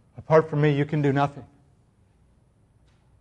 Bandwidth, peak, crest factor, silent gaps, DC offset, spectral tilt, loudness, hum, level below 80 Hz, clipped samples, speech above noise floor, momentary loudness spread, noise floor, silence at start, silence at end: 7.2 kHz; -6 dBFS; 20 dB; none; under 0.1%; -8.5 dB/octave; -23 LUFS; none; -60 dBFS; under 0.1%; 39 dB; 7 LU; -61 dBFS; 0.2 s; 1.75 s